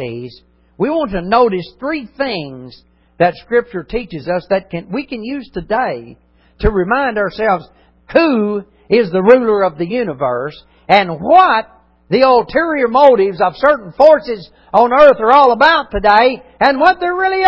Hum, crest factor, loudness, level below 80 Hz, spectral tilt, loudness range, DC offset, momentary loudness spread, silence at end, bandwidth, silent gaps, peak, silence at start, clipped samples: none; 14 dB; -13 LUFS; -36 dBFS; -7.5 dB/octave; 9 LU; under 0.1%; 14 LU; 0 s; 8 kHz; none; 0 dBFS; 0 s; 0.2%